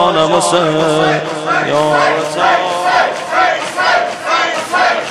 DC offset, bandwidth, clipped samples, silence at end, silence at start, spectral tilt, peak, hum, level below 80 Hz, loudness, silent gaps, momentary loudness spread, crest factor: under 0.1%; 13.5 kHz; under 0.1%; 0 s; 0 s; -3.5 dB/octave; 0 dBFS; none; -54 dBFS; -13 LUFS; none; 3 LU; 12 dB